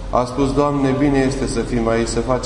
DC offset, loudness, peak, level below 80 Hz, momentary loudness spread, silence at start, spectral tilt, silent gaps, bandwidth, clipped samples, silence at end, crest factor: under 0.1%; -18 LUFS; -4 dBFS; -30 dBFS; 4 LU; 0 s; -6 dB/octave; none; 11 kHz; under 0.1%; 0 s; 14 dB